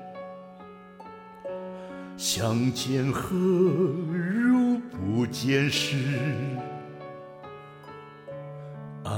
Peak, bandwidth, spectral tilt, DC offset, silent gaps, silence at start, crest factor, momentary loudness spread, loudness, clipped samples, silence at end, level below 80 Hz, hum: -12 dBFS; 16.5 kHz; -5.5 dB/octave; under 0.1%; none; 0 s; 16 dB; 22 LU; -26 LUFS; under 0.1%; 0 s; -60 dBFS; none